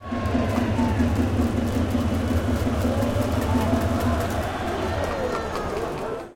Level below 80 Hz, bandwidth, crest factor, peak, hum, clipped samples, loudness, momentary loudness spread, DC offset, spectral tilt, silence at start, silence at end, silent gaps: -36 dBFS; 17 kHz; 14 dB; -8 dBFS; none; under 0.1%; -24 LUFS; 5 LU; under 0.1%; -6.5 dB/octave; 0 s; 0 s; none